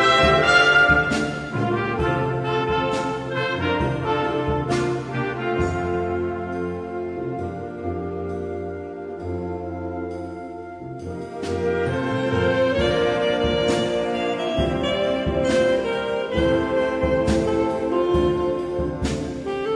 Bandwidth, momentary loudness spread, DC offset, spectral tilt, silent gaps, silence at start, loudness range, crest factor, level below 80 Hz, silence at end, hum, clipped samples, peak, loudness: 10.5 kHz; 11 LU; under 0.1%; -5.5 dB/octave; none; 0 s; 8 LU; 18 dB; -38 dBFS; 0 s; none; under 0.1%; -4 dBFS; -22 LUFS